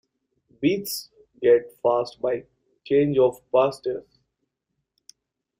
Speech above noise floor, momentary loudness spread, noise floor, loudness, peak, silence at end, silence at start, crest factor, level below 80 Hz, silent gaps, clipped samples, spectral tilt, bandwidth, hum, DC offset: 57 dB; 11 LU; -80 dBFS; -23 LUFS; -8 dBFS; 1.6 s; 0.6 s; 18 dB; -62 dBFS; none; under 0.1%; -5.5 dB/octave; 16 kHz; none; under 0.1%